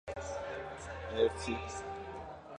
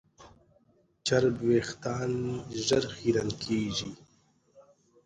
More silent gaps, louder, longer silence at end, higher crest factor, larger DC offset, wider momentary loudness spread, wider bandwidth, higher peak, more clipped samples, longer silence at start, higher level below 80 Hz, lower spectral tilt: neither; second, -38 LUFS vs -29 LUFS; second, 0 s vs 0.45 s; about the same, 22 dB vs 20 dB; neither; first, 12 LU vs 8 LU; about the same, 10.5 kHz vs 10 kHz; second, -16 dBFS vs -10 dBFS; neither; second, 0.05 s vs 0.2 s; first, -52 dBFS vs -58 dBFS; about the same, -4.5 dB/octave vs -5 dB/octave